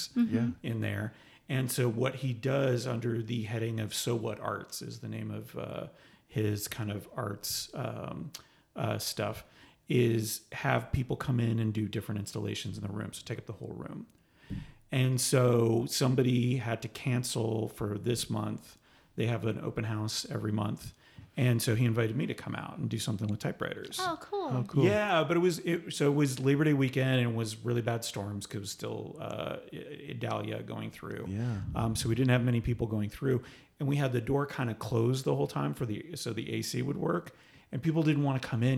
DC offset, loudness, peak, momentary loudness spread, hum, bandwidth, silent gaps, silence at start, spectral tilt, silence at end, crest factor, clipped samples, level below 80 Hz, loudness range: under 0.1%; -32 LUFS; -12 dBFS; 13 LU; none; 16.5 kHz; none; 0 s; -5.5 dB/octave; 0 s; 20 dB; under 0.1%; -58 dBFS; 8 LU